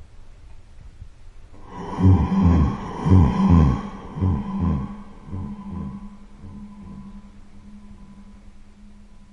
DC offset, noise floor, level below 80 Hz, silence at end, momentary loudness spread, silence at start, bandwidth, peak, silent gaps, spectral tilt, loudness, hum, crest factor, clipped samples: under 0.1%; -44 dBFS; -34 dBFS; 0.45 s; 24 LU; 0 s; 7 kHz; -4 dBFS; none; -9.5 dB/octave; -20 LUFS; none; 18 dB; under 0.1%